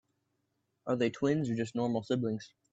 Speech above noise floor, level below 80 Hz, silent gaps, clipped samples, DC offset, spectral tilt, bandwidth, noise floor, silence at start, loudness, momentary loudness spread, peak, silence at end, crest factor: 48 dB; -72 dBFS; none; under 0.1%; under 0.1%; -7 dB/octave; 8 kHz; -80 dBFS; 0.85 s; -33 LUFS; 7 LU; -18 dBFS; 0.25 s; 16 dB